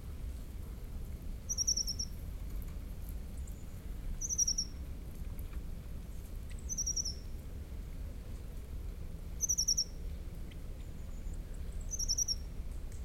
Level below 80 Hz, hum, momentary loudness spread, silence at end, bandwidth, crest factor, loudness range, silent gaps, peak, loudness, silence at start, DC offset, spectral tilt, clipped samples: -42 dBFS; none; 16 LU; 0 s; 16 kHz; 20 dB; 5 LU; none; -20 dBFS; -38 LUFS; 0 s; under 0.1%; -2 dB/octave; under 0.1%